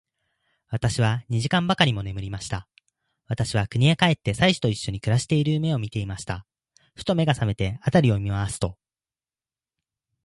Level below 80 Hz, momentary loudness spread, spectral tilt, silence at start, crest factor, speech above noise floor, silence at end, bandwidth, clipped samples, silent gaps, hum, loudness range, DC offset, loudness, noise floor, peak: -46 dBFS; 12 LU; -5.5 dB/octave; 0.7 s; 22 dB; over 67 dB; 1.5 s; 11.5 kHz; under 0.1%; none; none; 3 LU; under 0.1%; -24 LUFS; under -90 dBFS; -2 dBFS